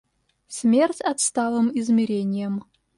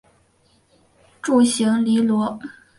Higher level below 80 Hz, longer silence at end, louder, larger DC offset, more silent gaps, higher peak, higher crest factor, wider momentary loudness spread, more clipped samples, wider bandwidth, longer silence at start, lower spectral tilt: about the same, -68 dBFS vs -64 dBFS; about the same, 0.35 s vs 0.25 s; second, -22 LUFS vs -19 LUFS; neither; neither; about the same, -8 dBFS vs -6 dBFS; about the same, 14 dB vs 16 dB; about the same, 10 LU vs 12 LU; neither; about the same, 11.5 kHz vs 11.5 kHz; second, 0.5 s vs 1.25 s; about the same, -4.5 dB/octave vs -4.5 dB/octave